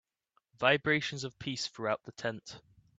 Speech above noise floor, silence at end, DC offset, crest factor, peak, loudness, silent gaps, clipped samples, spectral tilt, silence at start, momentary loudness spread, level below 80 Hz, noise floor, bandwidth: 43 dB; 0.4 s; under 0.1%; 24 dB; -10 dBFS; -32 LUFS; none; under 0.1%; -4 dB/octave; 0.6 s; 17 LU; -70 dBFS; -77 dBFS; 9.2 kHz